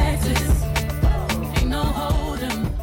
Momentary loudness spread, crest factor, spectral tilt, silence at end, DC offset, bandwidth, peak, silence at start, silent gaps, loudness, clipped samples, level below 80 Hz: 4 LU; 12 dB; -5.5 dB/octave; 0 s; under 0.1%; 17 kHz; -10 dBFS; 0 s; none; -22 LUFS; under 0.1%; -24 dBFS